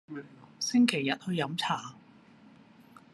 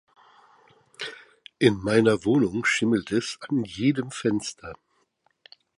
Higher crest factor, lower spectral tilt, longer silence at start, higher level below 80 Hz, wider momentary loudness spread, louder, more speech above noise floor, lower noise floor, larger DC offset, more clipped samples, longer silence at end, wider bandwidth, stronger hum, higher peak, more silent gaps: about the same, 24 dB vs 22 dB; second, -4 dB/octave vs -5.5 dB/octave; second, 0.1 s vs 1 s; second, -78 dBFS vs -58 dBFS; first, 19 LU vs 16 LU; second, -29 LUFS vs -24 LUFS; second, 27 dB vs 46 dB; second, -57 dBFS vs -69 dBFS; neither; neither; about the same, 1.15 s vs 1.05 s; about the same, 12.5 kHz vs 11.5 kHz; neither; second, -8 dBFS vs -4 dBFS; neither